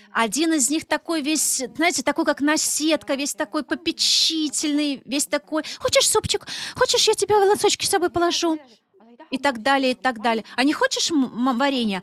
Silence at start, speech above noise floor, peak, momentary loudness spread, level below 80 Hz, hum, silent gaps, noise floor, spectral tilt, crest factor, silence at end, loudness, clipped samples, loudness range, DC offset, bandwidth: 0.15 s; 28 dB; -6 dBFS; 8 LU; -58 dBFS; none; none; -49 dBFS; -2 dB/octave; 16 dB; 0 s; -21 LUFS; under 0.1%; 3 LU; under 0.1%; 15.5 kHz